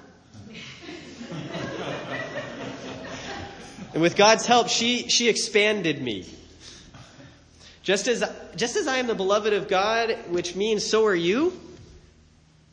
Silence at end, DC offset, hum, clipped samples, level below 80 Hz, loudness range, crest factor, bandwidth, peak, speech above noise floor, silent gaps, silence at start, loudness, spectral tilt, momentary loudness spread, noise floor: 0.75 s; under 0.1%; none; under 0.1%; -58 dBFS; 13 LU; 22 dB; 10 kHz; -4 dBFS; 33 dB; none; 0.35 s; -23 LUFS; -3 dB/octave; 21 LU; -56 dBFS